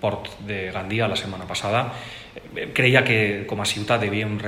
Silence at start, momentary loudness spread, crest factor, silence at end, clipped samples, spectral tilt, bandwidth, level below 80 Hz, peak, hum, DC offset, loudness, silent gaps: 0 s; 15 LU; 24 dB; 0 s; under 0.1%; -4.5 dB/octave; 16 kHz; -54 dBFS; 0 dBFS; none; under 0.1%; -22 LUFS; none